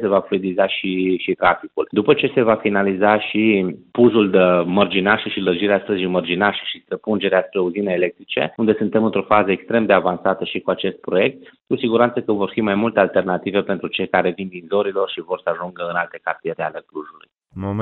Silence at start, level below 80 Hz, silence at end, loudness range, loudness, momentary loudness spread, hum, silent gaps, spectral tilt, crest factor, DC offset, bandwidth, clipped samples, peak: 0 s; -58 dBFS; 0 s; 5 LU; -19 LUFS; 9 LU; none; none; -10.5 dB/octave; 18 dB; under 0.1%; 4.3 kHz; under 0.1%; 0 dBFS